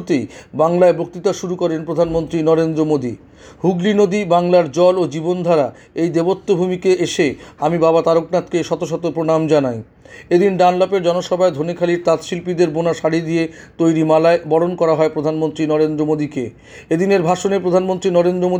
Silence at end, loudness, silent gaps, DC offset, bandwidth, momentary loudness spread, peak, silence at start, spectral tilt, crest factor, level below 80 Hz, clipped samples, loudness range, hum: 0 s; -16 LUFS; none; under 0.1%; 9.8 kHz; 7 LU; -2 dBFS; 0 s; -6.5 dB/octave; 14 dB; -52 dBFS; under 0.1%; 1 LU; none